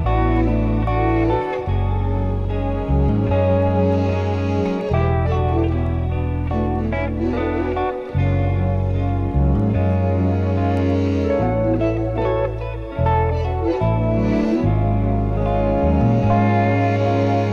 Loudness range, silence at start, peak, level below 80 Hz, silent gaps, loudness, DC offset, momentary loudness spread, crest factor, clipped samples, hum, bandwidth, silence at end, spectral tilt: 3 LU; 0 s; -6 dBFS; -26 dBFS; none; -19 LUFS; under 0.1%; 5 LU; 12 dB; under 0.1%; none; 6.6 kHz; 0 s; -9.5 dB/octave